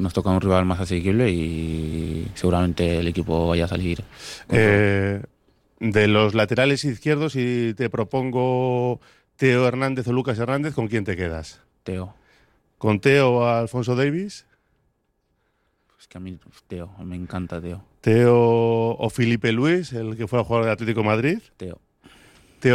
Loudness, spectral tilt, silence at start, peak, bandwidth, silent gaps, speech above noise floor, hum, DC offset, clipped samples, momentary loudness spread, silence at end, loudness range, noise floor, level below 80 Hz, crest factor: -21 LUFS; -7 dB/octave; 0 s; -4 dBFS; 13.5 kHz; none; 49 dB; none; under 0.1%; under 0.1%; 17 LU; 0 s; 6 LU; -70 dBFS; -44 dBFS; 18 dB